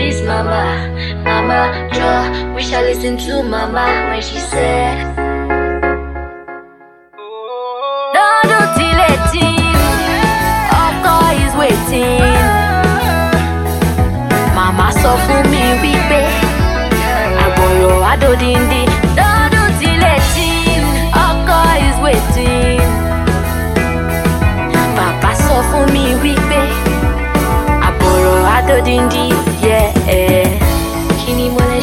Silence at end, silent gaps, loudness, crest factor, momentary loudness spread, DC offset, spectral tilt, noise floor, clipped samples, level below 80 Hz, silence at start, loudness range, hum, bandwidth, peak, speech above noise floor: 0 s; none; -12 LUFS; 12 dB; 7 LU; under 0.1%; -5 dB/octave; -41 dBFS; under 0.1%; -18 dBFS; 0 s; 5 LU; none; 16.5 kHz; 0 dBFS; 28 dB